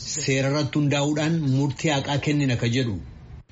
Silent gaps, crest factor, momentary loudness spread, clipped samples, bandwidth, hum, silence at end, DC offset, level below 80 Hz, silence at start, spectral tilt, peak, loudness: none; 14 dB; 3 LU; under 0.1%; 8 kHz; none; 0.1 s; under 0.1%; -48 dBFS; 0 s; -5.5 dB/octave; -10 dBFS; -23 LUFS